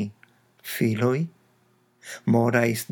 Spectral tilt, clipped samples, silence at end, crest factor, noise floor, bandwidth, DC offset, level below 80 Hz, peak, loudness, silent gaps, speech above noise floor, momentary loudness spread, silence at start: -6 dB/octave; under 0.1%; 0.1 s; 20 dB; -64 dBFS; over 20 kHz; under 0.1%; -78 dBFS; -6 dBFS; -24 LUFS; none; 41 dB; 15 LU; 0 s